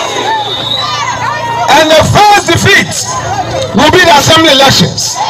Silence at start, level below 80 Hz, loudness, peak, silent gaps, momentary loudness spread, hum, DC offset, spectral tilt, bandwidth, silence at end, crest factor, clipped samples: 0 s; -32 dBFS; -6 LUFS; 0 dBFS; none; 10 LU; none; under 0.1%; -3 dB/octave; 19 kHz; 0 s; 8 dB; 1%